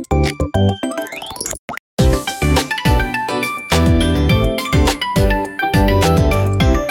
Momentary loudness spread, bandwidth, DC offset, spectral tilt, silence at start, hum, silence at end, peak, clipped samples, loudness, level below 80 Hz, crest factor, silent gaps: 10 LU; 17.5 kHz; under 0.1%; -5.5 dB/octave; 0 s; none; 0 s; -2 dBFS; under 0.1%; -16 LUFS; -22 dBFS; 14 dB; 1.59-1.68 s, 1.79-1.97 s